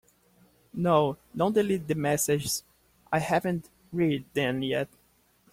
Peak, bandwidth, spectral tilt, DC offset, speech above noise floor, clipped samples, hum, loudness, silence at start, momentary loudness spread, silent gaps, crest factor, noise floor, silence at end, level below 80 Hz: -8 dBFS; 16.5 kHz; -5 dB/octave; under 0.1%; 39 dB; under 0.1%; none; -28 LUFS; 0.75 s; 8 LU; none; 20 dB; -65 dBFS; 0.65 s; -60 dBFS